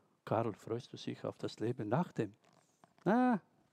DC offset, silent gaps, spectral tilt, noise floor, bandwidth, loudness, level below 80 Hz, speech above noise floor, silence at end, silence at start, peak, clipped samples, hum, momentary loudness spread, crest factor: under 0.1%; none; -7.5 dB/octave; -68 dBFS; 9.4 kHz; -37 LUFS; -80 dBFS; 32 dB; 0.3 s; 0.25 s; -18 dBFS; under 0.1%; none; 11 LU; 20 dB